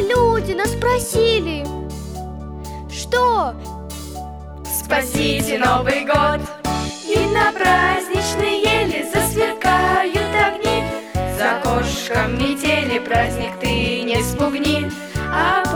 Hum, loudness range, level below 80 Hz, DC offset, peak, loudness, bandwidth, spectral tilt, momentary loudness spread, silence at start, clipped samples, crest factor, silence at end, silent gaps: none; 5 LU; -34 dBFS; 0.1%; -2 dBFS; -18 LUFS; over 20 kHz; -4 dB/octave; 14 LU; 0 s; under 0.1%; 16 dB; 0 s; none